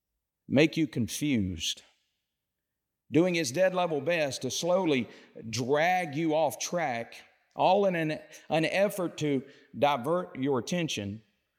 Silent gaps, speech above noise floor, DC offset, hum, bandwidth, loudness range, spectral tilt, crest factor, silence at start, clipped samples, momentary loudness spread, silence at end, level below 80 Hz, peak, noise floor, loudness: none; 58 dB; under 0.1%; none; 17 kHz; 2 LU; -4.5 dB/octave; 18 dB; 0.5 s; under 0.1%; 11 LU; 0.4 s; -70 dBFS; -10 dBFS; -86 dBFS; -29 LUFS